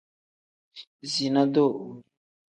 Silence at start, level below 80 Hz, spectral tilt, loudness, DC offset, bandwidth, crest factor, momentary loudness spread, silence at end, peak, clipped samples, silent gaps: 0.75 s; -76 dBFS; -5.5 dB/octave; -24 LUFS; under 0.1%; 9.8 kHz; 20 dB; 23 LU; 0.5 s; -8 dBFS; under 0.1%; 0.87-0.99 s